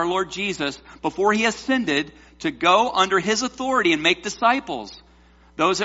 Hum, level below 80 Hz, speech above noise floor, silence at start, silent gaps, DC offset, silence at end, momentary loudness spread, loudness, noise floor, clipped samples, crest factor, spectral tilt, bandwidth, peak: none; -54 dBFS; 31 dB; 0 s; none; under 0.1%; 0 s; 12 LU; -21 LUFS; -52 dBFS; under 0.1%; 18 dB; -1.5 dB/octave; 8 kHz; -4 dBFS